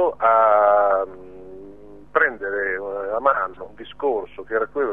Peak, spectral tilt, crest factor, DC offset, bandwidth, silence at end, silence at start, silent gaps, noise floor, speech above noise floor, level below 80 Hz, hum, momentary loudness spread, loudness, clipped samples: -4 dBFS; -6.5 dB/octave; 18 dB; 0.5%; 3.8 kHz; 0 s; 0 s; none; -43 dBFS; 21 dB; -56 dBFS; none; 23 LU; -20 LUFS; under 0.1%